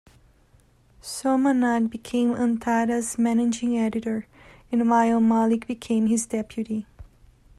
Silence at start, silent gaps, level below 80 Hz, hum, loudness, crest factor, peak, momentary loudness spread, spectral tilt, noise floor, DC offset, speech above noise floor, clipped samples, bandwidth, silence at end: 1.05 s; none; -56 dBFS; none; -23 LUFS; 16 dB; -8 dBFS; 10 LU; -5 dB/octave; -58 dBFS; under 0.1%; 36 dB; under 0.1%; 12.5 kHz; 0.55 s